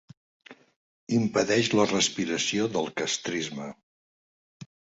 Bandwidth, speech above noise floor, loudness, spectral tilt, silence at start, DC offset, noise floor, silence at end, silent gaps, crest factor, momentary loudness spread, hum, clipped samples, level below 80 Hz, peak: 8 kHz; over 64 dB; -26 LUFS; -3.5 dB/octave; 0.5 s; under 0.1%; under -90 dBFS; 0.3 s; 0.76-1.07 s, 3.83-4.60 s; 22 dB; 10 LU; none; under 0.1%; -66 dBFS; -8 dBFS